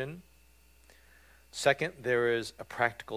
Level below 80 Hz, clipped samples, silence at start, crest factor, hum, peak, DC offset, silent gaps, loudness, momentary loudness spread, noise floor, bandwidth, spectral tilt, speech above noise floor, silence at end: -64 dBFS; under 0.1%; 0 s; 22 dB; none; -12 dBFS; under 0.1%; none; -31 LUFS; 14 LU; -62 dBFS; 16 kHz; -4 dB/octave; 31 dB; 0 s